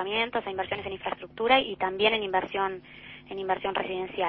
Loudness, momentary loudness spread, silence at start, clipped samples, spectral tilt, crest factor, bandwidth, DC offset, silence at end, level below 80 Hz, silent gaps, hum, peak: -28 LUFS; 14 LU; 0 s; under 0.1%; -7 dB/octave; 22 dB; 5.8 kHz; under 0.1%; 0 s; -60 dBFS; none; none; -6 dBFS